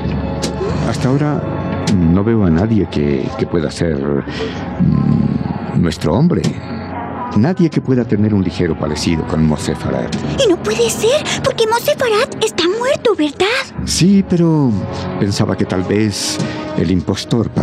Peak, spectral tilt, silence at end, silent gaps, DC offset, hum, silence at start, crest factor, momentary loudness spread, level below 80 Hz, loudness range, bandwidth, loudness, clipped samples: -2 dBFS; -5.5 dB/octave; 0 s; none; under 0.1%; none; 0 s; 12 dB; 7 LU; -36 dBFS; 2 LU; 15.5 kHz; -16 LUFS; under 0.1%